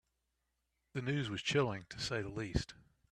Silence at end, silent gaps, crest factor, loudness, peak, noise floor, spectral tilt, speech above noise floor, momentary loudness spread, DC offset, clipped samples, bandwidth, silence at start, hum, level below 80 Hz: 0.4 s; none; 20 dB; -38 LUFS; -20 dBFS; -84 dBFS; -5 dB/octave; 47 dB; 8 LU; under 0.1%; under 0.1%; 12 kHz; 0.95 s; none; -54 dBFS